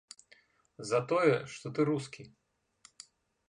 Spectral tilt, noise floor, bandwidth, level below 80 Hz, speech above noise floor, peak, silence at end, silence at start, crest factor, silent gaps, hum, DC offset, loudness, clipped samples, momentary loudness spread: -6 dB/octave; -65 dBFS; 11 kHz; -76 dBFS; 34 dB; -14 dBFS; 1.2 s; 0.8 s; 20 dB; none; none; under 0.1%; -31 LUFS; under 0.1%; 25 LU